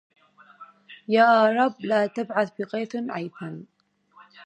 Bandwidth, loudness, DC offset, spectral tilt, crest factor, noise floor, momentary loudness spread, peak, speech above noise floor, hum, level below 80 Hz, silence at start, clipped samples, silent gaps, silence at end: 8.6 kHz; -23 LUFS; under 0.1%; -6.5 dB/octave; 20 dB; -56 dBFS; 20 LU; -6 dBFS; 33 dB; none; -78 dBFS; 0.6 s; under 0.1%; none; 0 s